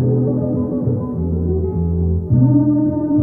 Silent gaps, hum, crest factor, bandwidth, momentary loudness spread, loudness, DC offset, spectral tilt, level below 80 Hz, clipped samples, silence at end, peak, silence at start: none; none; 14 dB; 1.8 kHz; 7 LU; -17 LUFS; under 0.1%; -15 dB/octave; -30 dBFS; under 0.1%; 0 s; -2 dBFS; 0 s